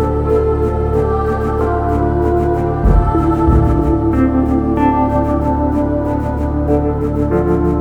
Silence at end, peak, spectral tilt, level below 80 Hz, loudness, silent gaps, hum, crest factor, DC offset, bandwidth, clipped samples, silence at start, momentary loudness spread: 0 s; 0 dBFS; -10 dB/octave; -20 dBFS; -15 LUFS; none; none; 12 dB; under 0.1%; 4.9 kHz; under 0.1%; 0 s; 4 LU